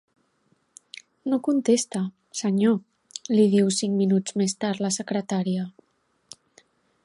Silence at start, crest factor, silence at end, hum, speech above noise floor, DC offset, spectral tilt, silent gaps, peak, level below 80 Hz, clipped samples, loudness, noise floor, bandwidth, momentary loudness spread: 1.25 s; 18 dB; 1.35 s; none; 45 dB; under 0.1%; -5.5 dB/octave; none; -8 dBFS; -72 dBFS; under 0.1%; -24 LUFS; -68 dBFS; 11.5 kHz; 17 LU